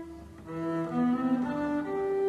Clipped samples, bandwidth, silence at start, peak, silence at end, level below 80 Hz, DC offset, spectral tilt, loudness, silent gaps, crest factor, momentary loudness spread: under 0.1%; 9.2 kHz; 0 s; -18 dBFS; 0 s; -58 dBFS; under 0.1%; -8 dB/octave; -30 LUFS; none; 12 dB; 14 LU